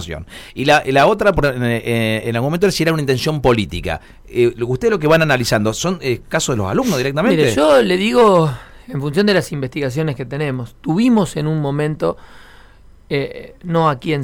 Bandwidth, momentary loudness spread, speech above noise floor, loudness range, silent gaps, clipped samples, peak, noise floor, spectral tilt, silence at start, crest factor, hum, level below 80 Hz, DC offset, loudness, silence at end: 17 kHz; 12 LU; 27 dB; 5 LU; none; under 0.1%; -4 dBFS; -43 dBFS; -5.5 dB/octave; 0 s; 14 dB; none; -38 dBFS; under 0.1%; -16 LUFS; 0 s